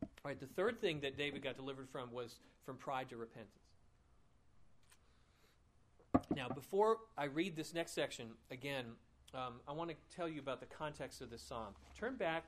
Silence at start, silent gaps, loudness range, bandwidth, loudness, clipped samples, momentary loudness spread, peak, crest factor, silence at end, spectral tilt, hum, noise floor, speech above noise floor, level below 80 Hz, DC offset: 0 s; none; 11 LU; 15 kHz; -43 LUFS; under 0.1%; 14 LU; -18 dBFS; 26 dB; 0 s; -5 dB/octave; none; -72 dBFS; 28 dB; -68 dBFS; under 0.1%